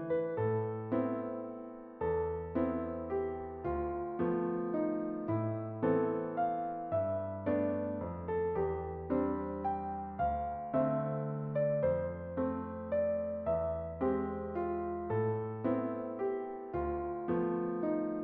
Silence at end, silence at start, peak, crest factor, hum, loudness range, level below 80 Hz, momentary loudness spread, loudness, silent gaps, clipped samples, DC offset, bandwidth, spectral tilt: 0 s; 0 s; -18 dBFS; 16 dB; none; 2 LU; -56 dBFS; 5 LU; -35 LUFS; none; under 0.1%; under 0.1%; 4 kHz; -9.5 dB/octave